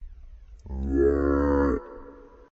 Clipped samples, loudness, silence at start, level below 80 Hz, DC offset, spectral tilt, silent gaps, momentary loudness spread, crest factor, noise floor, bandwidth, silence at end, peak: under 0.1%; -25 LUFS; 0 s; -34 dBFS; under 0.1%; -9.5 dB/octave; none; 19 LU; 14 dB; -47 dBFS; 6.8 kHz; 0.3 s; -12 dBFS